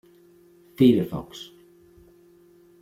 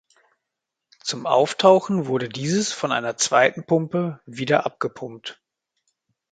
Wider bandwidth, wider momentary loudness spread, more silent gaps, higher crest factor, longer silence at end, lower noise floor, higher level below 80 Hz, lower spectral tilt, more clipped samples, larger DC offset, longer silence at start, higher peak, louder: first, 15 kHz vs 9.4 kHz; first, 23 LU vs 15 LU; neither; about the same, 22 dB vs 22 dB; first, 1.4 s vs 1 s; second, -55 dBFS vs -83 dBFS; first, -58 dBFS vs -68 dBFS; first, -7.5 dB/octave vs -4 dB/octave; neither; neither; second, 0.8 s vs 1.05 s; second, -6 dBFS vs -2 dBFS; about the same, -22 LUFS vs -21 LUFS